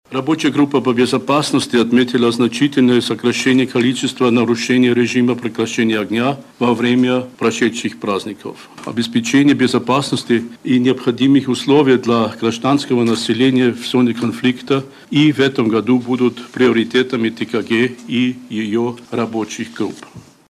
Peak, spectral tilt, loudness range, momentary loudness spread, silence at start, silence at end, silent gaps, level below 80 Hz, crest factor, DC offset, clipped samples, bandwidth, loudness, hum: -2 dBFS; -5.5 dB/octave; 3 LU; 8 LU; 0.1 s; 0.35 s; none; -58 dBFS; 14 dB; under 0.1%; under 0.1%; 13 kHz; -16 LUFS; none